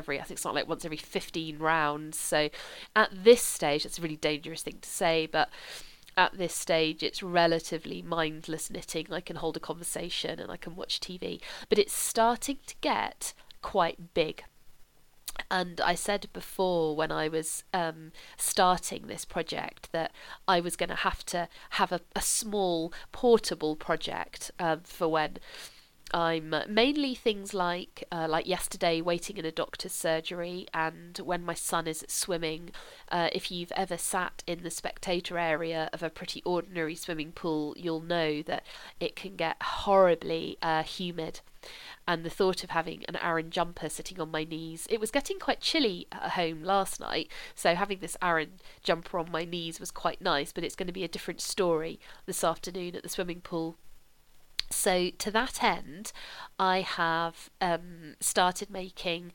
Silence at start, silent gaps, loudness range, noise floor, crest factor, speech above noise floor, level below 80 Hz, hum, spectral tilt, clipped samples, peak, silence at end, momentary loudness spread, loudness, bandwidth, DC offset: 0 s; none; 5 LU; -56 dBFS; 24 dB; 25 dB; -52 dBFS; none; -3 dB/octave; under 0.1%; -6 dBFS; 0 s; 11 LU; -31 LUFS; 19 kHz; under 0.1%